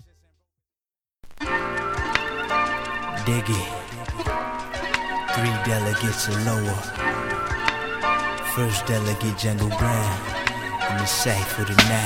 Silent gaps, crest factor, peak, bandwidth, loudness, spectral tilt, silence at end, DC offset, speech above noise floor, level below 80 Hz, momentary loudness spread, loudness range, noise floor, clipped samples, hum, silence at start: none; 24 dB; 0 dBFS; 17 kHz; -24 LUFS; -4 dB/octave; 0 s; under 0.1%; over 68 dB; -40 dBFS; 6 LU; 2 LU; under -90 dBFS; under 0.1%; none; 1.25 s